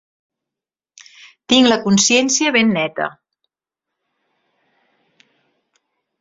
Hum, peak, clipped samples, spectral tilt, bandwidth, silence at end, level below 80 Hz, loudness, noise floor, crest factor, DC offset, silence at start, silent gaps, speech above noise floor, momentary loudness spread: none; 0 dBFS; under 0.1%; -3 dB/octave; 8 kHz; 3.1 s; -60 dBFS; -14 LUFS; -87 dBFS; 20 dB; under 0.1%; 1.5 s; none; 72 dB; 10 LU